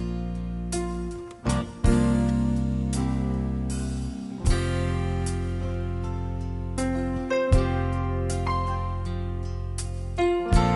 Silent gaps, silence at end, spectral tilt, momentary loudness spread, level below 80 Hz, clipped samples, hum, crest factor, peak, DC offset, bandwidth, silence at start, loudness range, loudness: none; 0 s; -6.5 dB/octave; 9 LU; -30 dBFS; under 0.1%; none; 18 dB; -6 dBFS; under 0.1%; 11.5 kHz; 0 s; 3 LU; -27 LUFS